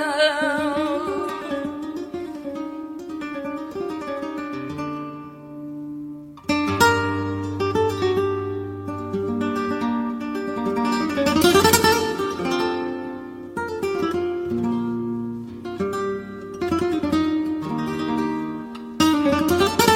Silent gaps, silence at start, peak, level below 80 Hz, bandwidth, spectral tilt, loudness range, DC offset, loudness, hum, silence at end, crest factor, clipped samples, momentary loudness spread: none; 0 s; -2 dBFS; -54 dBFS; 16.5 kHz; -4.5 dB/octave; 10 LU; under 0.1%; -23 LUFS; none; 0 s; 22 dB; under 0.1%; 15 LU